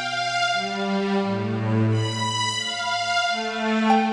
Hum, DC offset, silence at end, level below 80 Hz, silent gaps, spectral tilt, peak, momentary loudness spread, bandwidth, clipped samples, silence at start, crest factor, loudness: none; under 0.1%; 0 s; -64 dBFS; none; -4.5 dB/octave; -6 dBFS; 3 LU; 10.5 kHz; under 0.1%; 0 s; 16 dB; -23 LUFS